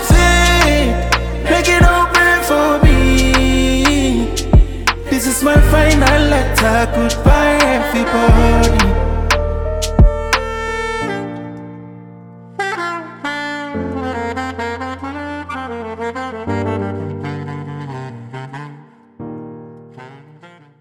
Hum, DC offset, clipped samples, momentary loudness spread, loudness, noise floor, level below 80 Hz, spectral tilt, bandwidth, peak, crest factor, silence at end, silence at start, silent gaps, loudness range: none; under 0.1%; under 0.1%; 19 LU; -14 LUFS; -43 dBFS; -18 dBFS; -5 dB/octave; 19.5 kHz; 0 dBFS; 14 dB; 0.35 s; 0 s; none; 12 LU